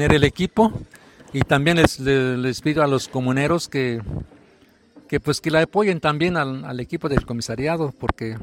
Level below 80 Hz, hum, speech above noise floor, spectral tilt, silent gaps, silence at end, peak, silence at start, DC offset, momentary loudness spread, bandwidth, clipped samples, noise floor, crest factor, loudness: -40 dBFS; none; 34 dB; -6 dB/octave; none; 0 s; 0 dBFS; 0 s; under 0.1%; 10 LU; 16.5 kHz; under 0.1%; -54 dBFS; 20 dB; -21 LUFS